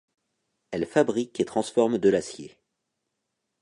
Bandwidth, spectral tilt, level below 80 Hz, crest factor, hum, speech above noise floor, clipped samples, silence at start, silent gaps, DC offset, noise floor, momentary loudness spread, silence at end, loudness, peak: 11 kHz; -5.5 dB/octave; -64 dBFS; 20 dB; none; 56 dB; under 0.1%; 0.7 s; none; under 0.1%; -81 dBFS; 14 LU; 1.15 s; -25 LUFS; -8 dBFS